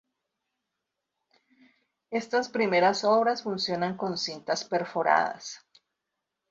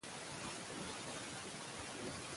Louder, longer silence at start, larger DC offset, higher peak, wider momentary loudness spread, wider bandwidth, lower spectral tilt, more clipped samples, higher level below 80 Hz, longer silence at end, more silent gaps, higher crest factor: first, -27 LUFS vs -46 LUFS; first, 2.1 s vs 0 s; neither; first, -8 dBFS vs -34 dBFS; first, 11 LU vs 1 LU; second, 8 kHz vs 11.5 kHz; first, -4 dB/octave vs -2.5 dB/octave; neither; second, -74 dBFS vs -68 dBFS; first, 0.95 s vs 0 s; neither; first, 20 dB vs 14 dB